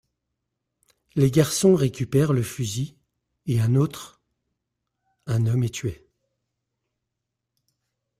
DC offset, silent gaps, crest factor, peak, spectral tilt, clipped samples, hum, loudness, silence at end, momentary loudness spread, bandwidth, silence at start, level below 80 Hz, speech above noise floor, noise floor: under 0.1%; none; 20 dB; -6 dBFS; -6.5 dB/octave; under 0.1%; none; -23 LUFS; 2.25 s; 16 LU; 16 kHz; 1.15 s; -56 dBFS; 61 dB; -82 dBFS